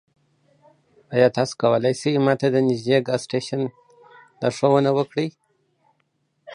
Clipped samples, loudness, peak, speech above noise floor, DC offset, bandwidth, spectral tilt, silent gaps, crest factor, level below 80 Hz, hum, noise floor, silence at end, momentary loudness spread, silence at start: under 0.1%; -21 LUFS; -4 dBFS; 50 dB; under 0.1%; 11 kHz; -6 dB/octave; none; 20 dB; -68 dBFS; none; -70 dBFS; 0 s; 9 LU; 1.1 s